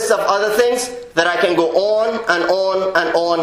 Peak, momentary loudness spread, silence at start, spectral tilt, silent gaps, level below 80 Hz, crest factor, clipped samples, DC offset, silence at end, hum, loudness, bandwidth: 0 dBFS; 2 LU; 0 s; -3 dB/octave; none; -54 dBFS; 16 dB; under 0.1%; under 0.1%; 0 s; none; -16 LUFS; 16 kHz